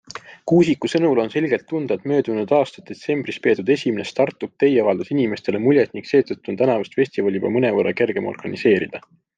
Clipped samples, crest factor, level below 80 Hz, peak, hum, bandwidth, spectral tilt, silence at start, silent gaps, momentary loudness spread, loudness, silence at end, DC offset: under 0.1%; 16 dB; -64 dBFS; -4 dBFS; none; 9.2 kHz; -7 dB/octave; 0.1 s; none; 8 LU; -20 LUFS; 0.4 s; under 0.1%